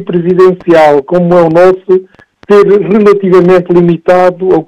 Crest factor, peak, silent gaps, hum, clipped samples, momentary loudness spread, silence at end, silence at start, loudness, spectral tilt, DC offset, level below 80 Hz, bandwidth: 6 dB; 0 dBFS; none; none; 5%; 3 LU; 0.05 s; 0 s; -6 LUFS; -8.5 dB/octave; under 0.1%; -44 dBFS; 8.8 kHz